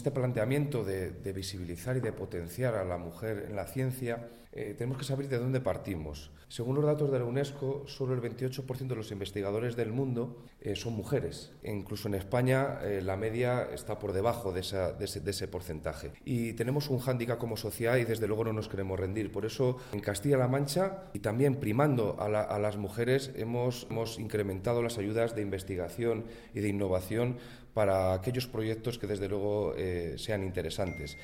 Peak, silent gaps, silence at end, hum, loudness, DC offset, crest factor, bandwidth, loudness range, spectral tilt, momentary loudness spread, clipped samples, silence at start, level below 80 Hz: -14 dBFS; none; 0 s; none; -33 LUFS; under 0.1%; 20 dB; 17 kHz; 5 LU; -6.5 dB/octave; 9 LU; under 0.1%; 0 s; -54 dBFS